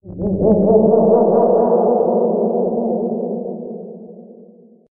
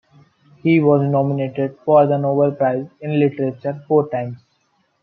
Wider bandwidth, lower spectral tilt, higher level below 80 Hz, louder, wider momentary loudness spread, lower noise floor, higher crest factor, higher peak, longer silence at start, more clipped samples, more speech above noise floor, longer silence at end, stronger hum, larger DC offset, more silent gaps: second, 1.8 kHz vs 4.7 kHz; about the same, -10 dB/octave vs -11 dB/octave; first, -46 dBFS vs -66 dBFS; first, -15 LUFS vs -18 LUFS; first, 17 LU vs 10 LU; second, -45 dBFS vs -64 dBFS; about the same, 14 dB vs 16 dB; about the same, -2 dBFS vs -2 dBFS; second, 0.05 s vs 0.65 s; neither; second, 32 dB vs 47 dB; about the same, 0.6 s vs 0.65 s; neither; neither; neither